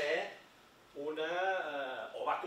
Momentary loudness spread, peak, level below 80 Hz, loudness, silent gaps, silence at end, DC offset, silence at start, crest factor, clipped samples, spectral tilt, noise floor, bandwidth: 12 LU; -22 dBFS; -82 dBFS; -38 LUFS; none; 0 s; under 0.1%; 0 s; 16 dB; under 0.1%; -3 dB/octave; -62 dBFS; 16 kHz